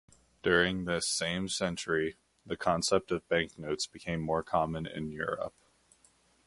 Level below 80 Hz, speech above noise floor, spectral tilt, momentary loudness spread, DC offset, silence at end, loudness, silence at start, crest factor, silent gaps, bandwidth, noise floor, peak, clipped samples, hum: -56 dBFS; 35 dB; -3.5 dB/octave; 9 LU; under 0.1%; 0.95 s; -32 LUFS; 0.45 s; 22 dB; none; 11.5 kHz; -67 dBFS; -12 dBFS; under 0.1%; none